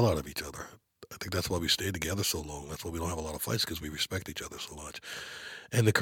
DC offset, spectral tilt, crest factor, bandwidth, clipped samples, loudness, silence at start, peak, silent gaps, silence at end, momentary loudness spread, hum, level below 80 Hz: under 0.1%; -4 dB/octave; 24 dB; 17.5 kHz; under 0.1%; -33 LUFS; 0 s; -8 dBFS; none; 0 s; 14 LU; none; -50 dBFS